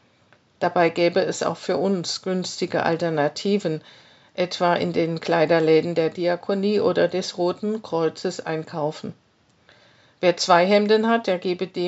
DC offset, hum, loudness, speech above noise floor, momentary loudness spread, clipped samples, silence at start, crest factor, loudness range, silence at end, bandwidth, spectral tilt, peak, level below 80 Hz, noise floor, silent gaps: under 0.1%; none; -22 LUFS; 37 dB; 10 LU; under 0.1%; 0.6 s; 20 dB; 4 LU; 0 s; 8 kHz; -4 dB/octave; -2 dBFS; -74 dBFS; -59 dBFS; none